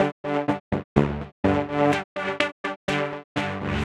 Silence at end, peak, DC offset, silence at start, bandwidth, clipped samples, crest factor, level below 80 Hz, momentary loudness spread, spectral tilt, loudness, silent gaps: 0 s; -4 dBFS; under 0.1%; 0 s; 11.5 kHz; under 0.1%; 22 dB; -44 dBFS; 7 LU; -6.5 dB/octave; -25 LUFS; 0.12-0.24 s, 0.60-0.71 s, 0.84-0.96 s, 1.32-1.43 s, 2.04-2.16 s, 2.52-2.64 s, 2.76-2.88 s, 3.24-3.35 s